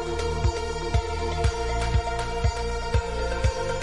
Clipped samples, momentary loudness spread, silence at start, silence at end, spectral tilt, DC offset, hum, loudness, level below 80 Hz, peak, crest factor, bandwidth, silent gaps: under 0.1%; 3 LU; 0 s; 0 s; -5 dB/octave; 0.6%; none; -27 LUFS; -30 dBFS; -10 dBFS; 16 dB; 11.5 kHz; none